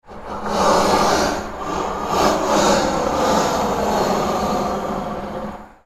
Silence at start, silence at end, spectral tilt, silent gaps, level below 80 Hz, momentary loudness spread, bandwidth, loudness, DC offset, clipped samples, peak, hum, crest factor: 0.05 s; 0.2 s; -4 dB/octave; none; -38 dBFS; 11 LU; 16.5 kHz; -19 LUFS; under 0.1%; under 0.1%; 0 dBFS; none; 18 dB